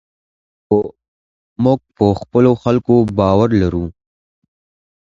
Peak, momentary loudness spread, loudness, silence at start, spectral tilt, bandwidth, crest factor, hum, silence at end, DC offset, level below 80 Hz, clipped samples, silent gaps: 0 dBFS; 6 LU; -15 LUFS; 0.7 s; -9 dB/octave; 7.6 kHz; 16 dB; none; 1.25 s; under 0.1%; -38 dBFS; under 0.1%; 1.08-1.56 s